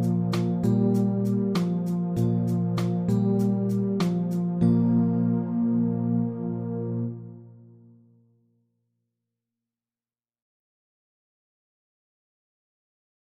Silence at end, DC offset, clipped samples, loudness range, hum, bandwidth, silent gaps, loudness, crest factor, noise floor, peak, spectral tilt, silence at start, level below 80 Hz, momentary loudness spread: 5.7 s; under 0.1%; under 0.1%; 12 LU; none; 14.5 kHz; none; -25 LUFS; 16 dB; under -90 dBFS; -10 dBFS; -9 dB/octave; 0 s; -62 dBFS; 8 LU